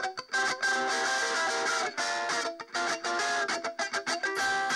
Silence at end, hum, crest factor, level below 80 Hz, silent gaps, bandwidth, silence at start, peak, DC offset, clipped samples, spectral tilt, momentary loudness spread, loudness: 0 s; none; 12 dB; -76 dBFS; none; 15 kHz; 0 s; -18 dBFS; under 0.1%; under 0.1%; 0 dB/octave; 4 LU; -29 LUFS